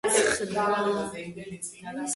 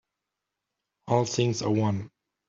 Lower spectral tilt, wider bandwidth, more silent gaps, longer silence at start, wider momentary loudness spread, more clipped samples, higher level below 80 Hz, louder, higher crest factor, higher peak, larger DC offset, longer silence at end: second, -2.5 dB/octave vs -6 dB/octave; first, 12 kHz vs 7.6 kHz; neither; second, 0.05 s vs 1.05 s; first, 15 LU vs 8 LU; neither; about the same, -60 dBFS vs -64 dBFS; about the same, -28 LUFS vs -27 LUFS; about the same, 18 dB vs 20 dB; about the same, -10 dBFS vs -10 dBFS; neither; second, 0 s vs 0.4 s